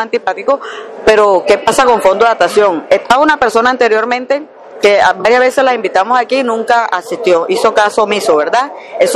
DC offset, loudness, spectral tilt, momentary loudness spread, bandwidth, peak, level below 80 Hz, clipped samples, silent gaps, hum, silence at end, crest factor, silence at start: under 0.1%; -11 LUFS; -3 dB/octave; 6 LU; 14 kHz; 0 dBFS; -48 dBFS; under 0.1%; none; none; 0 s; 10 dB; 0 s